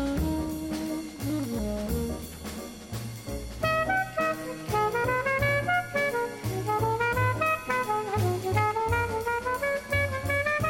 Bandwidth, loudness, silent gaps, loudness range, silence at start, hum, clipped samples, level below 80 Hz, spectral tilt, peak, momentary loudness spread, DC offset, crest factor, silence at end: 17 kHz; -28 LUFS; none; 5 LU; 0 s; none; under 0.1%; -44 dBFS; -5.5 dB/octave; -14 dBFS; 11 LU; under 0.1%; 14 dB; 0 s